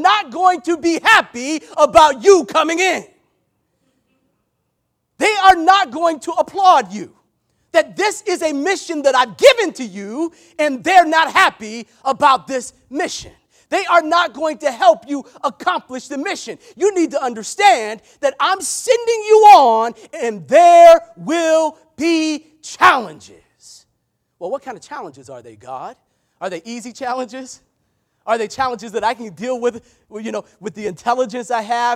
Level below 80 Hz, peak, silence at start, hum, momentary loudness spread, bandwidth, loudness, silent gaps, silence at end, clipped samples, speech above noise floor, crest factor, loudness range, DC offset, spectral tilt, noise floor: -56 dBFS; 0 dBFS; 0 s; none; 18 LU; 16.5 kHz; -15 LUFS; none; 0 s; 0.2%; 56 dB; 16 dB; 14 LU; under 0.1%; -2.5 dB/octave; -71 dBFS